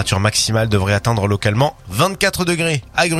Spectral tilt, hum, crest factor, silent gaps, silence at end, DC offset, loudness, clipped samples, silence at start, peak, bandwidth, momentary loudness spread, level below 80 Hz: -4.5 dB/octave; none; 16 dB; none; 0 s; under 0.1%; -17 LUFS; under 0.1%; 0 s; 0 dBFS; 15.5 kHz; 3 LU; -40 dBFS